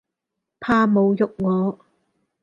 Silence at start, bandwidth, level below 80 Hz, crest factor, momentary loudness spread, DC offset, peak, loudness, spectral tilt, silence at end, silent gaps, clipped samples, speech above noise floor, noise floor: 0.6 s; 7.2 kHz; -58 dBFS; 16 dB; 9 LU; under 0.1%; -6 dBFS; -20 LUFS; -8.5 dB/octave; 0.7 s; none; under 0.1%; 63 dB; -82 dBFS